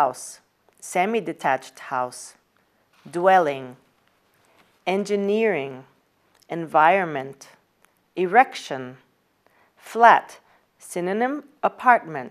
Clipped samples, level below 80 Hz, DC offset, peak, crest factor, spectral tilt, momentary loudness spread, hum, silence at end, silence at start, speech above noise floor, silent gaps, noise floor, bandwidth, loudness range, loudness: under 0.1%; -80 dBFS; under 0.1%; 0 dBFS; 24 dB; -4.5 dB/octave; 19 LU; none; 0 s; 0 s; 43 dB; none; -65 dBFS; 14.5 kHz; 4 LU; -22 LUFS